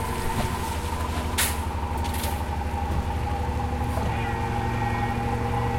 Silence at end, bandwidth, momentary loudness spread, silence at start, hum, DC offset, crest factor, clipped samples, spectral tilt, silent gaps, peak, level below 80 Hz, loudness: 0 s; 16.5 kHz; 4 LU; 0 s; none; under 0.1%; 16 dB; under 0.1%; -5 dB/octave; none; -10 dBFS; -32 dBFS; -27 LUFS